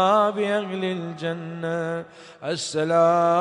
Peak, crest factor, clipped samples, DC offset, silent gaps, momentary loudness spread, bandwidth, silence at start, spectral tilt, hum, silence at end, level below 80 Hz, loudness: -6 dBFS; 16 dB; under 0.1%; under 0.1%; none; 12 LU; 10.5 kHz; 0 s; -5 dB/octave; none; 0 s; -70 dBFS; -24 LUFS